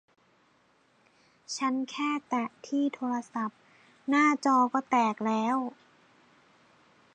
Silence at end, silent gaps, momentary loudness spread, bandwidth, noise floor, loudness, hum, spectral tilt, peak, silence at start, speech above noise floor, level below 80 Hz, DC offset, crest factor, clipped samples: 1.45 s; none; 11 LU; 9.4 kHz; -66 dBFS; -29 LUFS; none; -4 dB/octave; -12 dBFS; 1.5 s; 38 dB; -86 dBFS; under 0.1%; 20 dB; under 0.1%